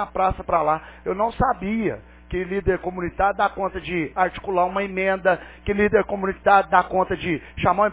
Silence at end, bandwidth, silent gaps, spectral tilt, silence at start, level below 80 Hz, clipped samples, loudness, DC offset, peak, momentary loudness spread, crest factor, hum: 0 s; 4 kHz; none; -10 dB/octave; 0 s; -40 dBFS; under 0.1%; -22 LUFS; under 0.1%; -2 dBFS; 8 LU; 20 dB; none